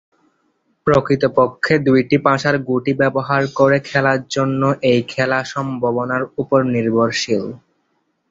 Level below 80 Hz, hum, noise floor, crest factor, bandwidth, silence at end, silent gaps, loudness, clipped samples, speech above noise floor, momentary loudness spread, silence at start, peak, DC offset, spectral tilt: -52 dBFS; none; -67 dBFS; 16 dB; 7.8 kHz; 0.75 s; none; -17 LUFS; under 0.1%; 50 dB; 6 LU; 0.85 s; -2 dBFS; under 0.1%; -6 dB/octave